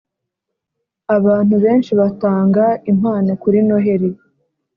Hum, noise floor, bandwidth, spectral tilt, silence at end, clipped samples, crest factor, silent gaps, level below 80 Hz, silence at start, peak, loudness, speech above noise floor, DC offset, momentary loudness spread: none; -78 dBFS; 5 kHz; -9 dB/octave; 0.65 s; under 0.1%; 14 dB; none; -56 dBFS; 1.1 s; -2 dBFS; -15 LUFS; 65 dB; under 0.1%; 5 LU